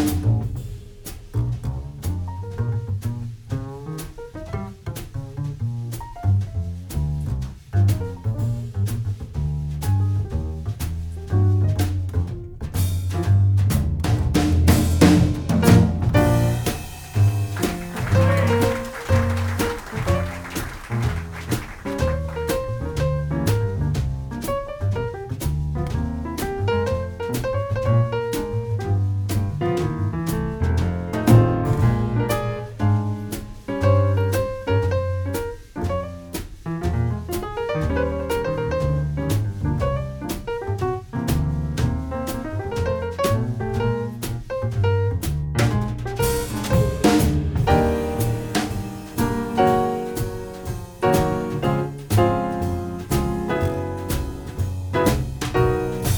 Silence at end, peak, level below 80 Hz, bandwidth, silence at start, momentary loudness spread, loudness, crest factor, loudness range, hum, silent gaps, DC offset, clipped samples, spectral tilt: 0 s; 0 dBFS; -34 dBFS; over 20 kHz; 0 s; 11 LU; -23 LUFS; 20 dB; 7 LU; none; none; under 0.1%; under 0.1%; -6.5 dB/octave